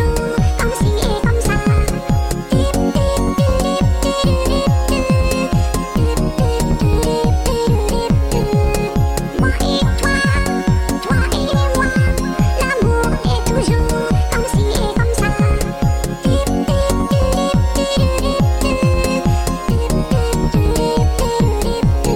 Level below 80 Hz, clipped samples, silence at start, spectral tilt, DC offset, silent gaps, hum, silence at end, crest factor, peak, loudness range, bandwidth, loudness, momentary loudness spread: -20 dBFS; under 0.1%; 0 s; -6 dB/octave; under 0.1%; none; none; 0 s; 12 dB; -2 dBFS; 1 LU; 17 kHz; -16 LUFS; 2 LU